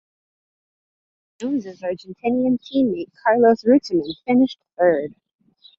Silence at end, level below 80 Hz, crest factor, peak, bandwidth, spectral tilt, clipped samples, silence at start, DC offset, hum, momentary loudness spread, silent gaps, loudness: 0.7 s; -62 dBFS; 16 dB; -4 dBFS; 7.4 kHz; -6.5 dB/octave; under 0.1%; 1.4 s; under 0.1%; none; 13 LU; none; -20 LUFS